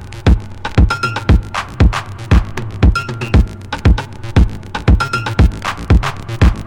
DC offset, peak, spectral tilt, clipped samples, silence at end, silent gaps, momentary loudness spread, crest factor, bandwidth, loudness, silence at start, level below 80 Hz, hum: under 0.1%; 0 dBFS; -6.5 dB/octave; 0.1%; 0 s; none; 6 LU; 14 dB; 11 kHz; -15 LUFS; 0 s; -16 dBFS; none